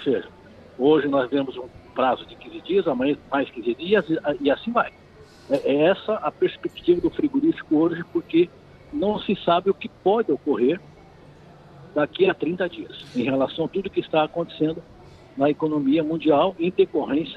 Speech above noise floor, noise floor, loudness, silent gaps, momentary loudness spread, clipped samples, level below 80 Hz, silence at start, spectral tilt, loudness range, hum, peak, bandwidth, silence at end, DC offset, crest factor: 25 dB; -48 dBFS; -23 LUFS; none; 9 LU; under 0.1%; -56 dBFS; 0 s; -8 dB/octave; 3 LU; none; -8 dBFS; 6.4 kHz; 0 s; under 0.1%; 16 dB